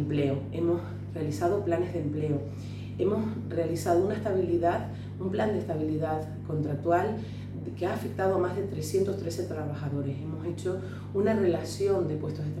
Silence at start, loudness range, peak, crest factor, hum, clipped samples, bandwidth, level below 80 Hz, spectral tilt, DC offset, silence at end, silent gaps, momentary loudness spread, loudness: 0 s; 2 LU; -12 dBFS; 16 dB; 50 Hz at -40 dBFS; under 0.1%; 14.5 kHz; -56 dBFS; -7.5 dB/octave; under 0.1%; 0 s; none; 8 LU; -30 LUFS